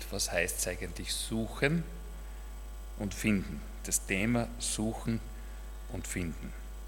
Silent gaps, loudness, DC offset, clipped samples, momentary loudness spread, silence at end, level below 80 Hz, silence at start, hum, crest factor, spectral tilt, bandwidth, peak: none; -33 LUFS; under 0.1%; under 0.1%; 16 LU; 0 s; -42 dBFS; 0 s; none; 24 dB; -4 dB/octave; 18 kHz; -10 dBFS